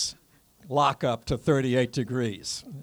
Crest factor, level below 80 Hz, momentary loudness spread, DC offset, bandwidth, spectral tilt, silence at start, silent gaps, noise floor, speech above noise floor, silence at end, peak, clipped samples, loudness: 18 dB; -50 dBFS; 7 LU; under 0.1%; over 20 kHz; -5 dB/octave; 0 s; none; -59 dBFS; 33 dB; 0 s; -8 dBFS; under 0.1%; -27 LUFS